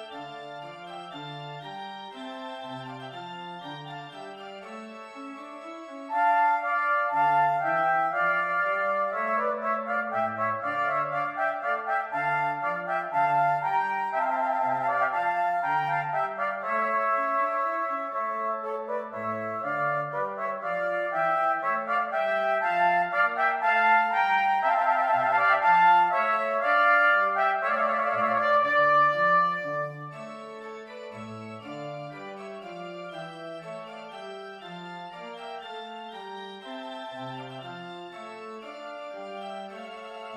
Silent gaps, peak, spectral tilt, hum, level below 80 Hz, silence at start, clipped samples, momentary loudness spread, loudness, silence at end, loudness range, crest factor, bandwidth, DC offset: none; -10 dBFS; -5.5 dB/octave; none; -78 dBFS; 0 s; under 0.1%; 19 LU; -25 LUFS; 0 s; 17 LU; 18 dB; 10 kHz; under 0.1%